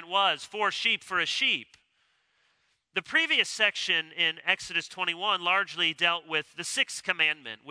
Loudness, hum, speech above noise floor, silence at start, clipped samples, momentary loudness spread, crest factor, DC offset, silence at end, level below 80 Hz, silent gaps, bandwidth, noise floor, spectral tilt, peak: -26 LUFS; none; 43 dB; 0 s; under 0.1%; 7 LU; 22 dB; under 0.1%; 0 s; -76 dBFS; none; 11 kHz; -72 dBFS; -1 dB/octave; -8 dBFS